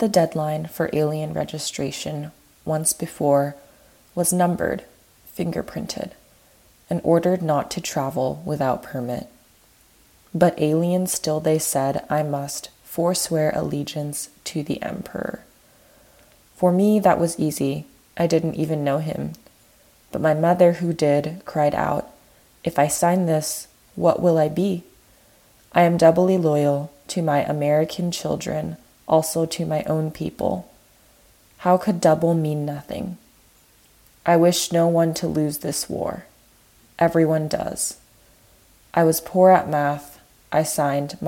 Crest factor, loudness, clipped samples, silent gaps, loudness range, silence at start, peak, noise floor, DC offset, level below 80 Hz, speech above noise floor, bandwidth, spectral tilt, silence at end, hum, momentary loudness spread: 20 dB; -22 LUFS; under 0.1%; none; 5 LU; 0 s; -2 dBFS; -55 dBFS; under 0.1%; -56 dBFS; 35 dB; 17.5 kHz; -5.5 dB/octave; 0 s; none; 13 LU